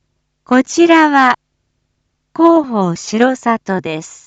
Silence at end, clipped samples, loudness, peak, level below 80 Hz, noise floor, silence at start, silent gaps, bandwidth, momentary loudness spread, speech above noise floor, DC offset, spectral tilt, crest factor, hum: 0.1 s; under 0.1%; -13 LUFS; 0 dBFS; -60 dBFS; -67 dBFS; 0.5 s; none; 8 kHz; 11 LU; 55 dB; under 0.1%; -5 dB/octave; 14 dB; none